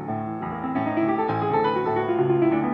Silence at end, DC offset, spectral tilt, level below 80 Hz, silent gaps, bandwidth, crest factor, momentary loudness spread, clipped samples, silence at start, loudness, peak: 0 s; under 0.1%; -10 dB/octave; -56 dBFS; none; 5.4 kHz; 12 dB; 9 LU; under 0.1%; 0 s; -24 LUFS; -10 dBFS